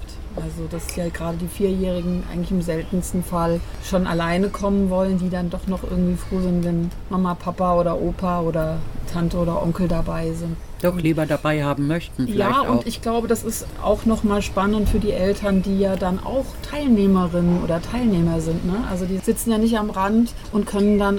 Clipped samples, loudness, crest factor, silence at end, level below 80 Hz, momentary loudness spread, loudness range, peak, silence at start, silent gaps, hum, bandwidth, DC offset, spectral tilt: under 0.1%; -22 LUFS; 14 dB; 0 s; -32 dBFS; 7 LU; 3 LU; -6 dBFS; 0 s; none; none; 18 kHz; 0.8%; -6.5 dB/octave